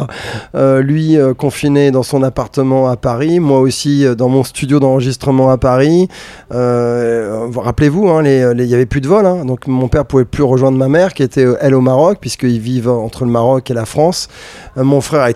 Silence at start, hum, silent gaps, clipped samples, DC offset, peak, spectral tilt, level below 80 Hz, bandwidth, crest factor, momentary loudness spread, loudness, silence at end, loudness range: 0 s; none; none; under 0.1%; under 0.1%; 0 dBFS; -7 dB/octave; -36 dBFS; 14 kHz; 12 dB; 7 LU; -12 LUFS; 0 s; 1 LU